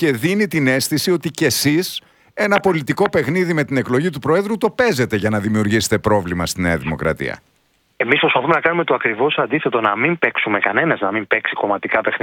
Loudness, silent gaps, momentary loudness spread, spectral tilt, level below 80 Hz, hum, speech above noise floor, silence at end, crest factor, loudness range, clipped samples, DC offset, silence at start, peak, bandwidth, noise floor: -17 LUFS; none; 5 LU; -4.5 dB/octave; -46 dBFS; none; 44 dB; 0.05 s; 18 dB; 2 LU; under 0.1%; under 0.1%; 0 s; 0 dBFS; 19 kHz; -61 dBFS